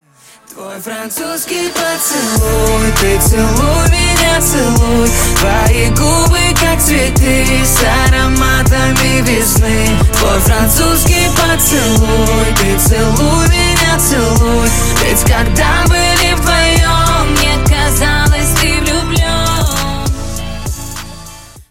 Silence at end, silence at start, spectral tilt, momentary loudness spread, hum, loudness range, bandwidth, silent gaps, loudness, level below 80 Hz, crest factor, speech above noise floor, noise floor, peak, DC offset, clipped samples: 0.1 s; 0.5 s; -4 dB/octave; 8 LU; none; 3 LU; 17 kHz; none; -10 LUFS; -16 dBFS; 10 dB; 32 dB; -42 dBFS; 0 dBFS; under 0.1%; under 0.1%